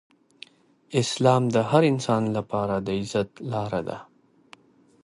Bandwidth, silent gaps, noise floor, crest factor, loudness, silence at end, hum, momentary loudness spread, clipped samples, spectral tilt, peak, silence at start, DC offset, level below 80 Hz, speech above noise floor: 11.5 kHz; none; -54 dBFS; 20 dB; -24 LUFS; 1 s; none; 10 LU; under 0.1%; -6 dB/octave; -6 dBFS; 0.9 s; under 0.1%; -58 dBFS; 31 dB